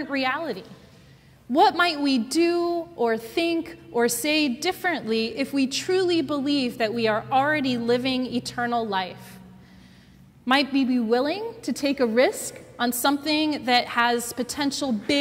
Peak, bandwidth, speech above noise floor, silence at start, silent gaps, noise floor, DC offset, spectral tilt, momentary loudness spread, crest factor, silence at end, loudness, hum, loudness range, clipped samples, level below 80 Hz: -6 dBFS; 16 kHz; 28 dB; 0 s; none; -52 dBFS; under 0.1%; -3.5 dB/octave; 8 LU; 18 dB; 0 s; -24 LUFS; none; 3 LU; under 0.1%; -60 dBFS